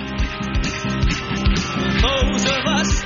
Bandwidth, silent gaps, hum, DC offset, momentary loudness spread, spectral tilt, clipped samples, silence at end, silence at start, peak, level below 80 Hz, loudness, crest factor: 7.4 kHz; none; none; under 0.1%; 5 LU; -4 dB/octave; under 0.1%; 0 s; 0 s; -4 dBFS; -24 dBFS; -20 LUFS; 14 dB